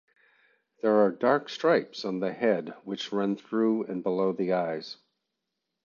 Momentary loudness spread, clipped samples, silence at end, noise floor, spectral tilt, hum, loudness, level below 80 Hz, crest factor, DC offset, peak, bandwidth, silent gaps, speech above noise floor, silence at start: 11 LU; under 0.1%; 0.9 s; -84 dBFS; -6.5 dB/octave; none; -28 LUFS; -78 dBFS; 18 dB; under 0.1%; -10 dBFS; 7.2 kHz; none; 57 dB; 0.85 s